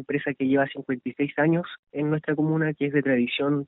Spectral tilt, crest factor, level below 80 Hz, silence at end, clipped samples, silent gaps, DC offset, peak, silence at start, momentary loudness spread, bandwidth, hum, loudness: -5.5 dB/octave; 16 dB; -66 dBFS; 0 s; under 0.1%; 1.79-1.83 s; under 0.1%; -10 dBFS; 0 s; 7 LU; 4.1 kHz; none; -25 LUFS